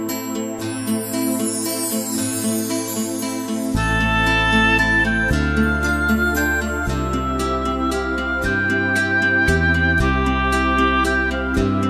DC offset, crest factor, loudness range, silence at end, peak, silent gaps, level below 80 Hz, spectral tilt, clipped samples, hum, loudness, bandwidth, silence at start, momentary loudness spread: under 0.1%; 14 dB; 4 LU; 0 s; -4 dBFS; none; -28 dBFS; -4.5 dB/octave; under 0.1%; none; -19 LUFS; 14 kHz; 0 s; 7 LU